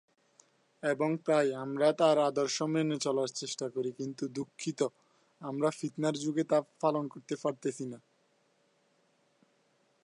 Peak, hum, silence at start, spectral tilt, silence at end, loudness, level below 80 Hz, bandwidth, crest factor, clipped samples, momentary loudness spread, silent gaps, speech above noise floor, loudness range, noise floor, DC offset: -12 dBFS; none; 0.85 s; -5 dB/octave; 2.05 s; -32 LUFS; -84 dBFS; 11.5 kHz; 20 dB; under 0.1%; 11 LU; none; 40 dB; 6 LU; -72 dBFS; under 0.1%